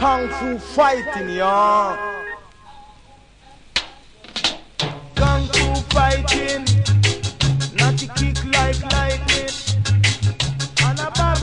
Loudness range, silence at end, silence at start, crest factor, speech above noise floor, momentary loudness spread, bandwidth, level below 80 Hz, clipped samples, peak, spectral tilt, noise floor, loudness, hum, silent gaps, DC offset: 6 LU; 0 s; 0 s; 16 dB; 28 dB; 9 LU; 10.5 kHz; -28 dBFS; under 0.1%; -2 dBFS; -4 dB/octave; -47 dBFS; -19 LUFS; none; none; under 0.1%